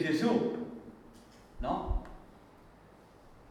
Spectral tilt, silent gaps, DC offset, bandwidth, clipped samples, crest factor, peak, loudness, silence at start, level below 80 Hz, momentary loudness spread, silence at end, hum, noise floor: -6.5 dB/octave; none; under 0.1%; 13.5 kHz; under 0.1%; 22 dB; -14 dBFS; -34 LUFS; 0 s; -44 dBFS; 27 LU; 0.05 s; none; -57 dBFS